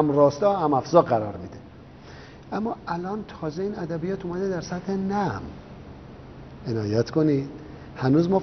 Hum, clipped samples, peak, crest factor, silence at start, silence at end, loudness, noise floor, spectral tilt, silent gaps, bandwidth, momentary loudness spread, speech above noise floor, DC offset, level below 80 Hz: none; under 0.1%; -2 dBFS; 24 dB; 0 s; 0 s; -25 LUFS; -45 dBFS; -7 dB/octave; none; 6.4 kHz; 24 LU; 21 dB; under 0.1%; -52 dBFS